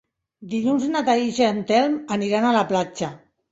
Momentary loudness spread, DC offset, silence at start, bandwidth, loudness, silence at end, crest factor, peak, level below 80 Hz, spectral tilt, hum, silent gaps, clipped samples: 9 LU; under 0.1%; 0.4 s; 8 kHz; -21 LUFS; 0.35 s; 18 dB; -4 dBFS; -64 dBFS; -5 dB/octave; none; none; under 0.1%